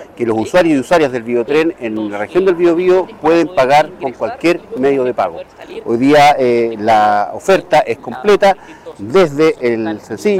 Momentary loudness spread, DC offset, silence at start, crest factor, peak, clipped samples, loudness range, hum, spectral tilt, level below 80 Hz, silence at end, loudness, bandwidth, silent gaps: 10 LU; under 0.1%; 0 s; 10 dB; -4 dBFS; under 0.1%; 2 LU; none; -5.5 dB/octave; -48 dBFS; 0 s; -13 LUFS; 15.5 kHz; none